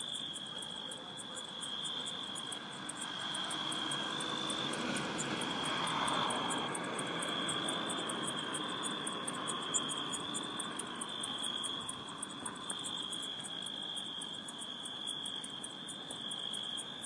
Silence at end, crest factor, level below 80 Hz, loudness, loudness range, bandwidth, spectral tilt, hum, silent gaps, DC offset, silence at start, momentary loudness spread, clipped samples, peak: 0 s; 20 dB; -76 dBFS; -38 LUFS; 5 LU; 11.5 kHz; -1.5 dB/octave; none; none; under 0.1%; 0 s; 7 LU; under 0.1%; -20 dBFS